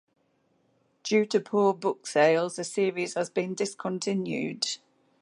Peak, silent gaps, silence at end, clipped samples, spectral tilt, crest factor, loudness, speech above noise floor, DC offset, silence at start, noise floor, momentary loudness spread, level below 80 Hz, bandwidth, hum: -8 dBFS; none; 0.45 s; under 0.1%; -4 dB/octave; 20 dB; -27 LUFS; 43 dB; under 0.1%; 1.05 s; -70 dBFS; 8 LU; -82 dBFS; 11.5 kHz; none